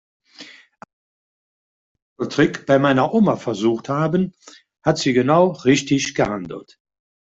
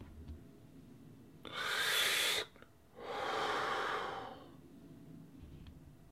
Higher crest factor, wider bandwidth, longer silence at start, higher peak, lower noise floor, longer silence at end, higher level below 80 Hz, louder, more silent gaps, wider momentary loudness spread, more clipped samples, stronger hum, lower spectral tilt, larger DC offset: about the same, 18 dB vs 20 dB; second, 8 kHz vs 16 kHz; first, 0.4 s vs 0 s; first, -2 dBFS vs -20 dBFS; second, -44 dBFS vs -61 dBFS; first, 0.6 s vs 0 s; first, -56 dBFS vs -64 dBFS; first, -19 LUFS vs -36 LUFS; first, 0.93-1.95 s, 2.02-2.16 s vs none; second, 10 LU vs 26 LU; neither; neither; first, -5.5 dB/octave vs -1.5 dB/octave; neither